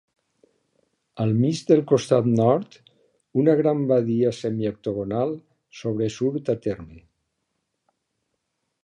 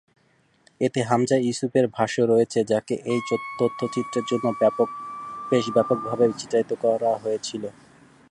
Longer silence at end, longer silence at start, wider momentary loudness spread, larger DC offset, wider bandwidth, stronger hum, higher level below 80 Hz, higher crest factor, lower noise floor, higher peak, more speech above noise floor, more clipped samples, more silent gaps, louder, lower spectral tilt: first, 1.85 s vs 0.6 s; first, 1.15 s vs 0.8 s; first, 10 LU vs 7 LU; neither; about the same, 11.5 kHz vs 11.5 kHz; neither; first, -60 dBFS vs -66 dBFS; about the same, 20 dB vs 18 dB; first, -77 dBFS vs -63 dBFS; about the same, -4 dBFS vs -6 dBFS; first, 55 dB vs 40 dB; neither; neither; about the same, -23 LUFS vs -23 LUFS; first, -7.5 dB/octave vs -5.5 dB/octave